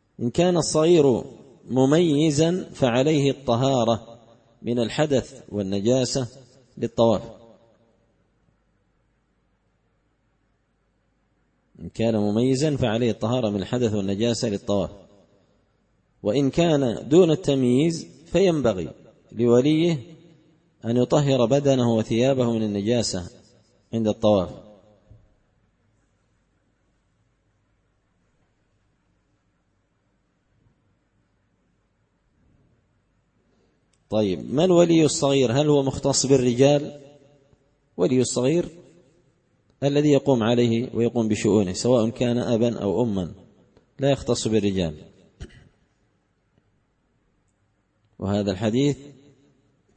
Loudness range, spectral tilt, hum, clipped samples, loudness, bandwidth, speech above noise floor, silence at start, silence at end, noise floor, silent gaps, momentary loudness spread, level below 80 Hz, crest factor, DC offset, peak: 8 LU; -6 dB/octave; none; under 0.1%; -22 LUFS; 8.8 kHz; 48 dB; 0.2 s; 0.85 s; -69 dBFS; none; 12 LU; -54 dBFS; 20 dB; under 0.1%; -4 dBFS